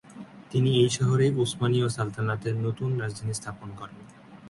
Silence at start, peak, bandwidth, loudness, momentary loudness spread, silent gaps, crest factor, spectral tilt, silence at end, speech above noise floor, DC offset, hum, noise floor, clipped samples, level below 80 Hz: 0.1 s; -10 dBFS; 11.5 kHz; -26 LUFS; 19 LU; none; 18 dB; -6 dB/octave; 0 s; 20 dB; under 0.1%; none; -45 dBFS; under 0.1%; -58 dBFS